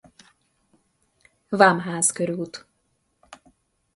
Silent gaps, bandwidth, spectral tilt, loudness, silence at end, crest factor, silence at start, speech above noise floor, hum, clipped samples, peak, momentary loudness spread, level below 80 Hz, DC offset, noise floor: none; 11.5 kHz; -3.5 dB/octave; -21 LUFS; 0.6 s; 26 dB; 1.5 s; 50 dB; none; under 0.1%; 0 dBFS; 17 LU; -70 dBFS; under 0.1%; -71 dBFS